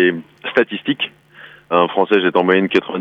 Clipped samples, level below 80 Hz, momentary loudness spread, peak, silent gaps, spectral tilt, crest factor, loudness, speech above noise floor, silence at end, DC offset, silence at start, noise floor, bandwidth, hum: under 0.1%; -64 dBFS; 7 LU; -2 dBFS; none; -7 dB/octave; 16 dB; -17 LUFS; 26 dB; 0 s; under 0.1%; 0 s; -42 dBFS; 6.6 kHz; none